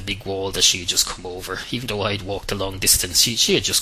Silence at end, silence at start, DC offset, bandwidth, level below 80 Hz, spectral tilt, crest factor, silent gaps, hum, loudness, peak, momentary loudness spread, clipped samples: 0 s; 0 s; under 0.1%; 16 kHz; -40 dBFS; -1.5 dB/octave; 20 dB; none; none; -19 LUFS; -2 dBFS; 12 LU; under 0.1%